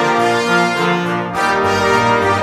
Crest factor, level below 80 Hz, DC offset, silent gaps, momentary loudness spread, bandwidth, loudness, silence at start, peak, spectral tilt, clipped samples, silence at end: 12 dB; -46 dBFS; under 0.1%; none; 4 LU; 16 kHz; -14 LUFS; 0 s; -2 dBFS; -4.5 dB/octave; under 0.1%; 0 s